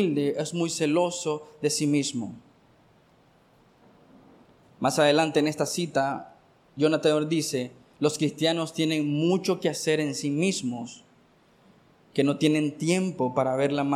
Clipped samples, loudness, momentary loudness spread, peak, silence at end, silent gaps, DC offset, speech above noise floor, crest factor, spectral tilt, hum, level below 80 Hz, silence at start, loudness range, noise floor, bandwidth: under 0.1%; -26 LUFS; 9 LU; -10 dBFS; 0 s; none; under 0.1%; 35 dB; 18 dB; -5 dB/octave; none; -70 dBFS; 0 s; 5 LU; -60 dBFS; 15 kHz